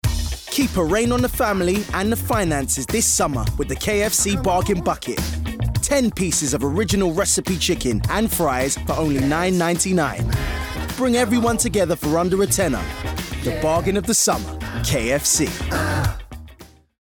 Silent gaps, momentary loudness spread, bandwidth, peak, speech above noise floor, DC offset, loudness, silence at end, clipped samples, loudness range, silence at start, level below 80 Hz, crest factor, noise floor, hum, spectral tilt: none; 8 LU; over 20 kHz; -8 dBFS; 26 dB; under 0.1%; -20 LUFS; 0.35 s; under 0.1%; 1 LU; 0.05 s; -32 dBFS; 12 dB; -45 dBFS; none; -4 dB/octave